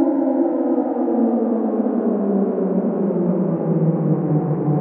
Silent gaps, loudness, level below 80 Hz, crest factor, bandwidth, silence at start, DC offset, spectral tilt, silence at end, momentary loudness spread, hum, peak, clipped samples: none; -19 LUFS; -66 dBFS; 12 dB; 2.9 kHz; 0 s; under 0.1%; -15 dB/octave; 0 s; 2 LU; none; -6 dBFS; under 0.1%